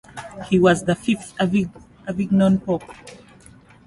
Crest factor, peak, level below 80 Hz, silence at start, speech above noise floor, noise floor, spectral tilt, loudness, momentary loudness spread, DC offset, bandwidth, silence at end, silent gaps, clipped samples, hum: 18 dB; -4 dBFS; -50 dBFS; 0.15 s; 28 dB; -48 dBFS; -6.5 dB/octave; -20 LUFS; 20 LU; under 0.1%; 11.5 kHz; 0.7 s; none; under 0.1%; none